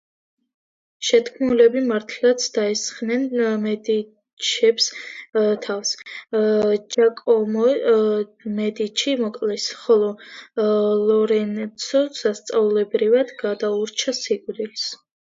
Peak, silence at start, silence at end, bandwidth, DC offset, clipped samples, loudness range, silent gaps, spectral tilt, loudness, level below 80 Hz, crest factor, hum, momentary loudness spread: -2 dBFS; 1 s; 0.4 s; 7.8 kHz; under 0.1%; under 0.1%; 2 LU; 4.33-4.37 s; -3.5 dB/octave; -21 LUFS; -68 dBFS; 18 dB; none; 8 LU